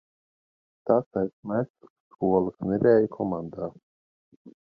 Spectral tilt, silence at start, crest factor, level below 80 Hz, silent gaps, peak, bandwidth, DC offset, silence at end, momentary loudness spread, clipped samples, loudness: -11.5 dB/octave; 0.85 s; 20 dB; -60 dBFS; 1.06-1.11 s, 1.33-1.43 s, 1.70-1.74 s, 1.90-2.11 s, 3.83-4.45 s; -8 dBFS; 5 kHz; under 0.1%; 0.25 s; 16 LU; under 0.1%; -26 LUFS